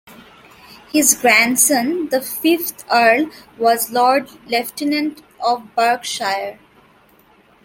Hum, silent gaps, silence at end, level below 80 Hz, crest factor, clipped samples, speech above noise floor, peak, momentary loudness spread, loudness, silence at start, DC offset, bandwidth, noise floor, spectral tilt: none; none; 1.1 s; -62 dBFS; 18 dB; under 0.1%; 35 dB; 0 dBFS; 10 LU; -16 LUFS; 0.1 s; under 0.1%; 17 kHz; -52 dBFS; -1.5 dB/octave